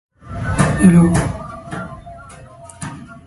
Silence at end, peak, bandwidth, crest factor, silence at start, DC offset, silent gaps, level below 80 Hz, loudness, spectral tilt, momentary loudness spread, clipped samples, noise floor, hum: 0.1 s; 0 dBFS; 11.5 kHz; 18 dB; 0.25 s; under 0.1%; none; -34 dBFS; -14 LUFS; -7 dB/octave; 25 LU; under 0.1%; -39 dBFS; none